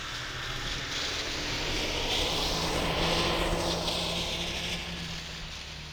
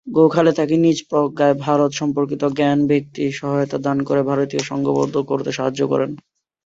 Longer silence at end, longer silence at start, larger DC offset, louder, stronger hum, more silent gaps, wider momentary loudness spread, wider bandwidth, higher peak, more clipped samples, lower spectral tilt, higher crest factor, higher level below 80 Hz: second, 0 s vs 0.45 s; about the same, 0 s vs 0.05 s; neither; second, -30 LUFS vs -19 LUFS; neither; neither; first, 9 LU vs 6 LU; first, over 20 kHz vs 7.8 kHz; second, -14 dBFS vs -2 dBFS; neither; second, -3 dB/octave vs -6.5 dB/octave; about the same, 18 dB vs 16 dB; first, -40 dBFS vs -58 dBFS